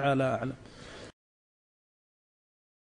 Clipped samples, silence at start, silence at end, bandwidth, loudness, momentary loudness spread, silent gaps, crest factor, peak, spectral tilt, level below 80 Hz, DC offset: under 0.1%; 0 s; 1.75 s; 10 kHz; -31 LUFS; 20 LU; none; 18 dB; -16 dBFS; -7 dB/octave; -62 dBFS; under 0.1%